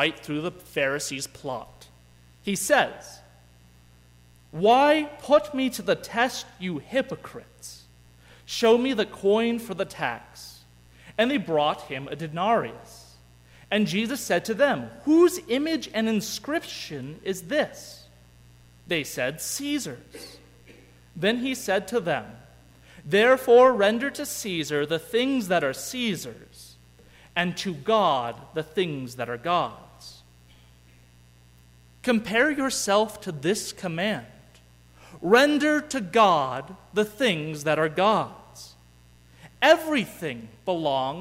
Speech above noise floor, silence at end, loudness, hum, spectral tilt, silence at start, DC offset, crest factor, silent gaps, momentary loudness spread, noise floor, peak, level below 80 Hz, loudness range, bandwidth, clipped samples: 30 dB; 0 s; -25 LUFS; 60 Hz at -55 dBFS; -4 dB/octave; 0 s; under 0.1%; 20 dB; none; 17 LU; -55 dBFS; -6 dBFS; -58 dBFS; 8 LU; 16 kHz; under 0.1%